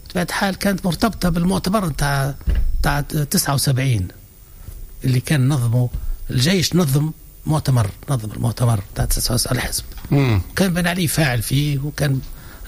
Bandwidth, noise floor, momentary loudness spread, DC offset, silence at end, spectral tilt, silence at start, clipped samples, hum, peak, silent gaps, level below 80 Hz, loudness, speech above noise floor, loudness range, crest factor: 16 kHz; -39 dBFS; 7 LU; under 0.1%; 0 s; -5 dB/octave; 0.05 s; under 0.1%; none; -4 dBFS; none; -30 dBFS; -19 LUFS; 20 dB; 2 LU; 14 dB